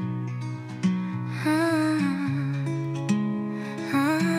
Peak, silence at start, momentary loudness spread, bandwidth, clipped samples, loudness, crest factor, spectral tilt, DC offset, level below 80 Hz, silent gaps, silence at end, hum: -12 dBFS; 0 s; 9 LU; 15.5 kHz; under 0.1%; -27 LUFS; 14 dB; -6.5 dB/octave; under 0.1%; -70 dBFS; none; 0 s; none